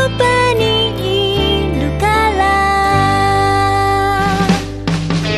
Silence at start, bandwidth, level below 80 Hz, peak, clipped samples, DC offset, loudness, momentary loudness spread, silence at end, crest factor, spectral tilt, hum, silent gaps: 0 s; 14 kHz; -26 dBFS; 0 dBFS; under 0.1%; under 0.1%; -13 LUFS; 4 LU; 0 s; 12 dB; -5 dB/octave; none; none